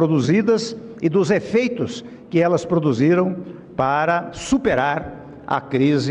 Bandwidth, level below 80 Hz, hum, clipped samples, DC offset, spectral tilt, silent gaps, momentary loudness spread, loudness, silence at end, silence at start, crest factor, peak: 10.5 kHz; -50 dBFS; none; under 0.1%; under 0.1%; -6.5 dB/octave; none; 11 LU; -20 LUFS; 0 s; 0 s; 14 dB; -6 dBFS